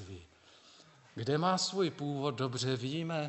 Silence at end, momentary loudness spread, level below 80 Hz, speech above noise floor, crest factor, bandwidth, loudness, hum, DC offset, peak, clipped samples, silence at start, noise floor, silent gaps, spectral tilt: 0 s; 18 LU; -72 dBFS; 27 dB; 18 dB; 8.2 kHz; -34 LUFS; none; under 0.1%; -18 dBFS; under 0.1%; 0 s; -61 dBFS; none; -5 dB/octave